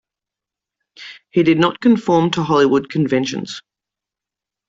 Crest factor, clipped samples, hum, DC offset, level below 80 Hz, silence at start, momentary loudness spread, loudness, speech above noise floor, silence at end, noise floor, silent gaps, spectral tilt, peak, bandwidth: 16 dB; under 0.1%; none; under 0.1%; -58 dBFS; 1 s; 19 LU; -16 LUFS; 71 dB; 1.1 s; -87 dBFS; none; -6 dB/octave; -2 dBFS; 7.8 kHz